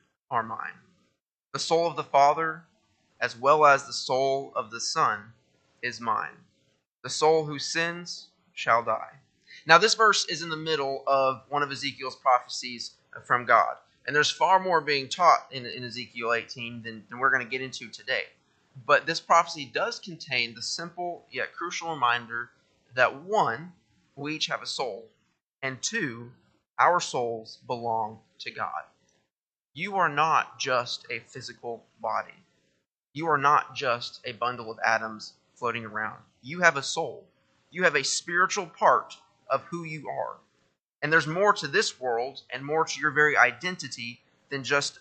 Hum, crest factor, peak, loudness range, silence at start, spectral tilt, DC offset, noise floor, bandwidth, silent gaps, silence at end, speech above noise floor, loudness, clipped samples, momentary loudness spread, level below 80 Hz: none; 26 dB; 0 dBFS; 5 LU; 0.3 s; -2.5 dB/octave; under 0.1%; -86 dBFS; 9 kHz; 1.21-1.27 s, 6.87-6.99 s, 25.46-25.59 s, 29.43-29.70 s, 32.88-33.01 s, 40.81-40.85 s, 40.95-40.99 s; 0.1 s; 60 dB; -26 LUFS; under 0.1%; 16 LU; -78 dBFS